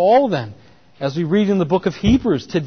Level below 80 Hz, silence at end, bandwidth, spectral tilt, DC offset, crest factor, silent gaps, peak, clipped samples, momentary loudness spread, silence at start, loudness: -38 dBFS; 0 s; 6.6 kHz; -7.5 dB/octave; 0.2%; 12 dB; none; -4 dBFS; under 0.1%; 9 LU; 0 s; -18 LUFS